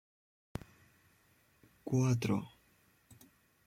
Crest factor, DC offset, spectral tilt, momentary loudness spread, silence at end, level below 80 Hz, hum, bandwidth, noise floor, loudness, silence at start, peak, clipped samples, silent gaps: 20 dB; under 0.1%; -7 dB/octave; 19 LU; 1.2 s; -64 dBFS; none; 15.5 kHz; -70 dBFS; -36 LUFS; 1.85 s; -20 dBFS; under 0.1%; none